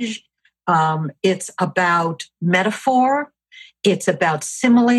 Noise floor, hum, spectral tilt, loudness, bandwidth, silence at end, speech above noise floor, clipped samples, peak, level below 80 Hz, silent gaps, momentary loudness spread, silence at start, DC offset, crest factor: -46 dBFS; none; -5 dB/octave; -19 LUFS; 12.5 kHz; 0 s; 28 dB; under 0.1%; -2 dBFS; -68 dBFS; none; 9 LU; 0 s; under 0.1%; 16 dB